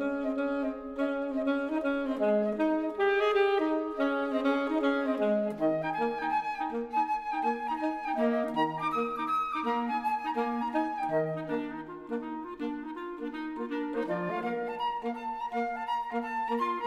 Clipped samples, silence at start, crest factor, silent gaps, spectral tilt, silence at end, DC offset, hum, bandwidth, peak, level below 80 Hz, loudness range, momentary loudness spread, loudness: under 0.1%; 0 s; 16 dB; none; -6.5 dB/octave; 0 s; under 0.1%; none; 12.5 kHz; -14 dBFS; -64 dBFS; 6 LU; 9 LU; -31 LUFS